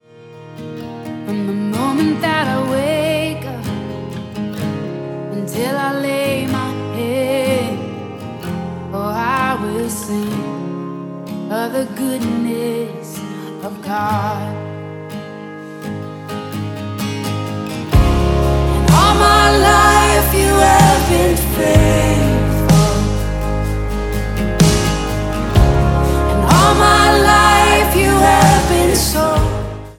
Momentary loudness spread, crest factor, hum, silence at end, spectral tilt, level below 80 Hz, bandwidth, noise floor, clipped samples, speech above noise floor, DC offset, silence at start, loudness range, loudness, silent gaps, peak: 17 LU; 14 dB; none; 0.05 s; -5 dB/octave; -24 dBFS; 17.5 kHz; -38 dBFS; under 0.1%; 23 dB; under 0.1%; 0.2 s; 11 LU; -15 LUFS; none; 0 dBFS